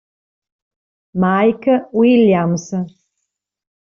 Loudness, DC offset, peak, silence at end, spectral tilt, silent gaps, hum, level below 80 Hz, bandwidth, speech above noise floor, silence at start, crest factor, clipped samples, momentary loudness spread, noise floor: -15 LUFS; under 0.1%; -2 dBFS; 1.05 s; -6.5 dB/octave; none; none; -58 dBFS; 7.2 kHz; 62 dB; 1.15 s; 14 dB; under 0.1%; 13 LU; -76 dBFS